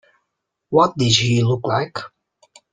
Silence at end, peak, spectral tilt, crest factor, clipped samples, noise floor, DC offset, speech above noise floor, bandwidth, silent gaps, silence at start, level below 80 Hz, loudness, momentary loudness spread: 0.65 s; -2 dBFS; -5 dB/octave; 18 dB; under 0.1%; -77 dBFS; under 0.1%; 59 dB; 9.4 kHz; none; 0.7 s; -52 dBFS; -18 LUFS; 15 LU